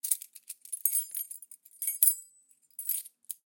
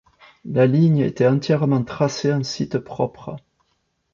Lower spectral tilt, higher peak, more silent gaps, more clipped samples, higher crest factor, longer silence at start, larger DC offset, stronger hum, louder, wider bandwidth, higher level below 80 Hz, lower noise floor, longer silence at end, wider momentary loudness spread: second, 7 dB/octave vs -7 dB/octave; about the same, -6 dBFS vs -4 dBFS; neither; neither; first, 30 dB vs 16 dB; second, 0.05 s vs 0.45 s; neither; neither; second, -29 LUFS vs -20 LUFS; first, 17.5 kHz vs 7.4 kHz; second, under -90 dBFS vs -56 dBFS; second, -64 dBFS vs -70 dBFS; second, 0.15 s vs 0.75 s; first, 21 LU vs 17 LU